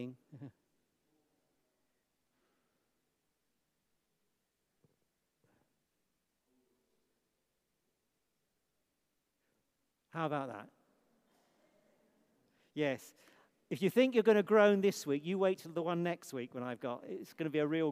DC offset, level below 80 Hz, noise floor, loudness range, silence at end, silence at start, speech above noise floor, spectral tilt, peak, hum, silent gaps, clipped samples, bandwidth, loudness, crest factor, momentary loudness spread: under 0.1%; under -90 dBFS; -84 dBFS; 14 LU; 0 s; 0 s; 51 dB; -6 dB/octave; -14 dBFS; none; none; under 0.1%; 15.5 kHz; -34 LUFS; 24 dB; 20 LU